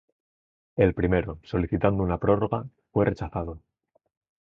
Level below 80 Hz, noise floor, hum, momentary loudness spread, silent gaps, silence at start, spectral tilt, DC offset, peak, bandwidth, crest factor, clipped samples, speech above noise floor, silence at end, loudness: -42 dBFS; under -90 dBFS; none; 10 LU; none; 0.75 s; -10 dB/octave; under 0.1%; -6 dBFS; 6.6 kHz; 22 dB; under 0.1%; over 65 dB; 0.85 s; -26 LUFS